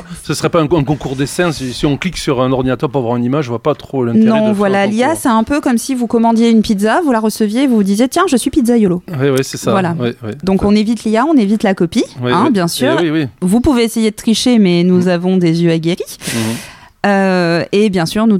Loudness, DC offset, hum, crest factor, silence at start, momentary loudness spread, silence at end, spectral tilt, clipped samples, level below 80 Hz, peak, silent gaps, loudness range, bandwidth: -13 LUFS; under 0.1%; none; 12 dB; 0 s; 6 LU; 0 s; -5.5 dB/octave; under 0.1%; -38 dBFS; -2 dBFS; none; 2 LU; 16 kHz